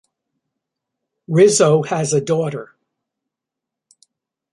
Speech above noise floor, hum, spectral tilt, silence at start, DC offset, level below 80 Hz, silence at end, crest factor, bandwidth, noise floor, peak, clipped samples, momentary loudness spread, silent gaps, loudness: 69 dB; none; -5 dB/octave; 1.3 s; under 0.1%; -64 dBFS; 1.9 s; 18 dB; 11.5 kHz; -84 dBFS; -2 dBFS; under 0.1%; 11 LU; none; -16 LUFS